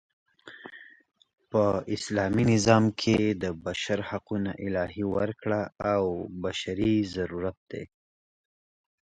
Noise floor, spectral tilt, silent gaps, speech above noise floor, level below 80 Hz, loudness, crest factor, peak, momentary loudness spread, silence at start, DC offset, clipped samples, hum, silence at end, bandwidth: -48 dBFS; -6 dB/octave; 7.57-7.66 s; 21 dB; -52 dBFS; -28 LUFS; 22 dB; -6 dBFS; 18 LU; 0.45 s; under 0.1%; under 0.1%; none; 1.15 s; 9.2 kHz